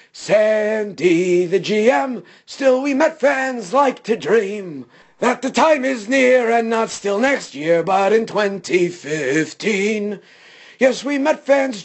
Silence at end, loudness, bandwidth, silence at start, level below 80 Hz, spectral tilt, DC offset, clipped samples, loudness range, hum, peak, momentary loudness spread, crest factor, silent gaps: 0 s; -17 LUFS; 8.6 kHz; 0.15 s; -66 dBFS; -4.5 dB/octave; under 0.1%; under 0.1%; 2 LU; none; -2 dBFS; 7 LU; 14 dB; none